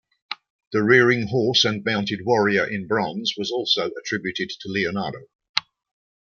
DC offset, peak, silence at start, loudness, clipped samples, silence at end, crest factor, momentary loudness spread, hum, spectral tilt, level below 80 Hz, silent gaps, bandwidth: under 0.1%; 0 dBFS; 0.3 s; -22 LUFS; under 0.1%; 0.65 s; 22 dB; 14 LU; none; -4.5 dB/octave; -64 dBFS; 0.50-0.59 s, 0.67-0.71 s, 5.35-5.39 s, 5.49-5.54 s; 7.2 kHz